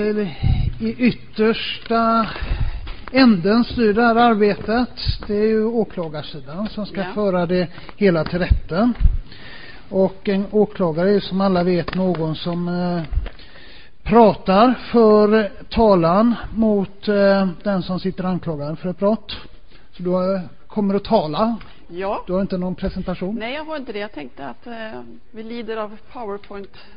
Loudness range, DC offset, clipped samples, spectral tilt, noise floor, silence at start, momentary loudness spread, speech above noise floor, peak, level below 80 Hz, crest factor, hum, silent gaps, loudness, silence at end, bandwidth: 10 LU; 2%; under 0.1%; -12 dB/octave; -44 dBFS; 0 s; 18 LU; 26 dB; 0 dBFS; -30 dBFS; 18 dB; none; none; -19 LUFS; 0.15 s; 5.2 kHz